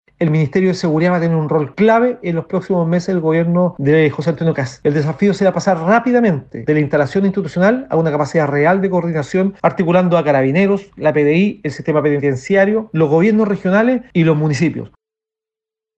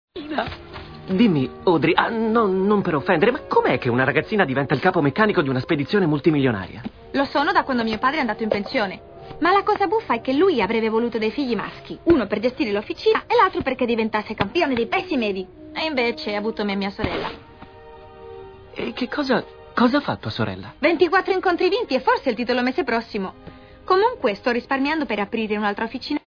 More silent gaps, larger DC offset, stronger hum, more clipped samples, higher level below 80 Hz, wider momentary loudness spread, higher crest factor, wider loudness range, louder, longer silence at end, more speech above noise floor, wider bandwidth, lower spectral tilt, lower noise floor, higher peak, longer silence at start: neither; neither; neither; neither; about the same, -52 dBFS vs -50 dBFS; second, 5 LU vs 10 LU; second, 14 dB vs 20 dB; second, 1 LU vs 6 LU; first, -15 LUFS vs -21 LUFS; first, 1.1 s vs 0.1 s; first, 73 dB vs 22 dB; first, 8.4 kHz vs 5.4 kHz; about the same, -8 dB/octave vs -7.5 dB/octave; first, -87 dBFS vs -43 dBFS; about the same, 0 dBFS vs -2 dBFS; about the same, 0.2 s vs 0.15 s